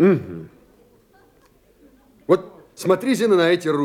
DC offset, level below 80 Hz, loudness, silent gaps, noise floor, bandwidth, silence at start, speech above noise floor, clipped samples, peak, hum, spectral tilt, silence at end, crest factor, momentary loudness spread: under 0.1%; -64 dBFS; -19 LUFS; none; -56 dBFS; 15.5 kHz; 0 s; 39 dB; under 0.1%; -4 dBFS; none; -6 dB/octave; 0 s; 18 dB; 21 LU